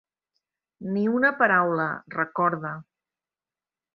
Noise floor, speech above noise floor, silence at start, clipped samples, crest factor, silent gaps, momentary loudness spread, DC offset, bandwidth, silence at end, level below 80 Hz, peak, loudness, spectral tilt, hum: under -90 dBFS; over 66 dB; 0.8 s; under 0.1%; 22 dB; none; 15 LU; under 0.1%; 5.8 kHz; 1.15 s; -72 dBFS; -4 dBFS; -24 LUFS; -9.5 dB/octave; none